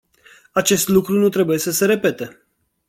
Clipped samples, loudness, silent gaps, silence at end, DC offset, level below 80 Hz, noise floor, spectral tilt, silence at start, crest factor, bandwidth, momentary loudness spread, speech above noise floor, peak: under 0.1%; -17 LUFS; none; 0.6 s; under 0.1%; -56 dBFS; -50 dBFS; -4 dB/octave; 0.55 s; 16 dB; 17 kHz; 8 LU; 33 dB; -2 dBFS